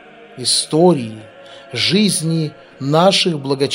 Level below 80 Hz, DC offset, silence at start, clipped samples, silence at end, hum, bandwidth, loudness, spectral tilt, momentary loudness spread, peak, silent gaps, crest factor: -62 dBFS; under 0.1%; 0.2 s; under 0.1%; 0 s; none; 16 kHz; -15 LUFS; -4 dB/octave; 14 LU; 0 dBFS; none; 16 dB